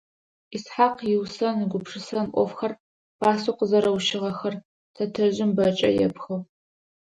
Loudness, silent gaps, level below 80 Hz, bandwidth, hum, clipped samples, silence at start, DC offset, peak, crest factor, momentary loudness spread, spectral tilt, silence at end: -24 LUFS; 2.80-3.19 s, 4.65-4.94 s; -62 dBFS; 10.5 kHz; none; under 0.1%; 0.5 s; under 0.1%; -6 dBFS; 20 dB; 12 LU; -5.5 dB/octave; 0.75 s